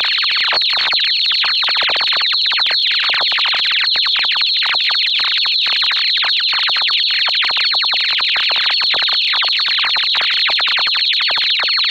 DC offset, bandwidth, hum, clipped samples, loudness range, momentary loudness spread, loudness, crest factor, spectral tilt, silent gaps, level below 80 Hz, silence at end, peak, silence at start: under 0.1%; 16.5 kHz; none; under 0.1%; 0 LU; 1 LU; -12 LUFS; 12 dB; 1.5 dB/octave; none; -62 dBFS; 0 s; -4 dBFS; 0 s